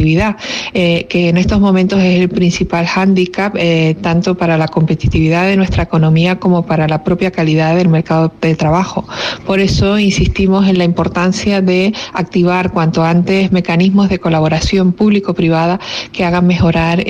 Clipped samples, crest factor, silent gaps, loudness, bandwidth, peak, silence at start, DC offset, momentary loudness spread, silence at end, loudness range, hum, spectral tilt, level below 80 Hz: under 0.1%; 10 dB; none; -12 LUFS; 8 kHz; -2 dBFS; 0 s; under 0.1%; 4 LU; 0 s; 1 LU; none; -6.5 dB/octave; -30 dBFS